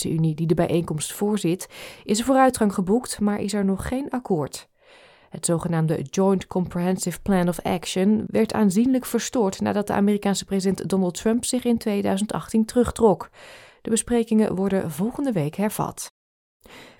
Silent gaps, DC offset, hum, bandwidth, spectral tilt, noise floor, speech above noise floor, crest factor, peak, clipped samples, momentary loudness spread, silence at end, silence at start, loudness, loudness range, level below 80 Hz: 16.11-16.60 s; under 0.1%; none; 18 kHz; -5.5 dB/octave; -52 dBFS; 30 dB; 18 dB; -4 dBFS; under 0.1%; 7 LU; 0.15 s; 0 s; -23 LUFS; 3 LU; -48 dBFS